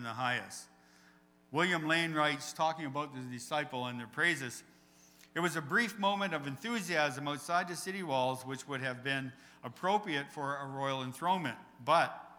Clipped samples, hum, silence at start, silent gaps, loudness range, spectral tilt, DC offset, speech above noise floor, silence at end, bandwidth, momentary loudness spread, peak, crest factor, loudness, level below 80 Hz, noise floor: under 0.1%; none; 0 s; none; 3 LU; -4 dB/octave; under 0.1%; 29 dB; 0 s; over 20 kHz; 11 LU; -14 dBFS; 22 dB; -34 LUFS; -80 dBFS; -64 dBFS